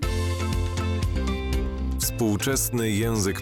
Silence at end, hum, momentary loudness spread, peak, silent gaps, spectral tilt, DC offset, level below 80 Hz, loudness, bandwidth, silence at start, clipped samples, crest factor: 0 s; none; 4 LU; -14 dBFS; none; -4.5 dB/octave; under 0.1%; -30 dBFS; -26 LUFS; 17.5 kHz; 0 s; under 0.1%; 12 dB